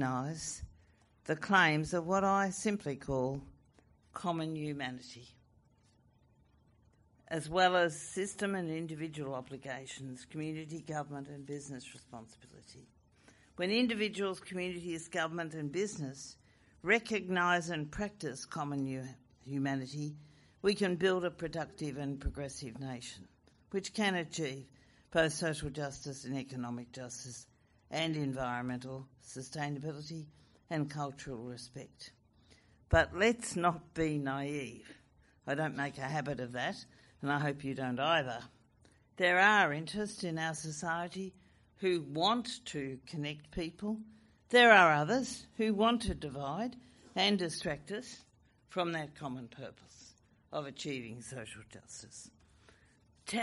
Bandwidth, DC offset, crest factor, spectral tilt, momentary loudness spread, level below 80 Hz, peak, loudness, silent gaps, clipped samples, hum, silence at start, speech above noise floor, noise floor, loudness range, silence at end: 11.5 kHz; under 0.1%; 26 dB; -4.5 dB/octave; 18 LU; -58 dBFS; -10 dBFS; -35 LUFS; none; under 0.1%; none; 0 s; 33 dB; -68 dBFS; 13 LU; 0 s